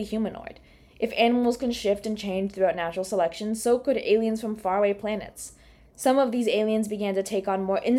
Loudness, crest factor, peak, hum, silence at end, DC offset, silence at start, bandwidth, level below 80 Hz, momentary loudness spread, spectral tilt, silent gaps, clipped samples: -26 LUFS; 16 dB; -8 dBFS; none; 0 s; under 0.1%; 0 s; 16 kHz; -56 dBFS; 10 LU; -5 dB/octave; none; under 0.1%